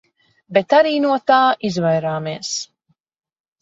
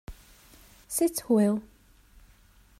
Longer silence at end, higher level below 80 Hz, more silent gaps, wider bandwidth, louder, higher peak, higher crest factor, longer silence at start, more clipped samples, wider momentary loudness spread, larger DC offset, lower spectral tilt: second, 1 s vs 1.2 s; second, -64 dBFS vs -54 dBFS; neither; second, 8 kHz vs 16 kHz; first, -17 LUFS vs -27 LUFS; first, -2 dBFS vs -12 dBFS; about the same, 18 dB vs 18 dB; first, 0.5 s vs 0.1 s; neither; about the same, 10 LU vs 10 LU; neither; about the same, -4.5 dB/octave vs -5.5 dB/octave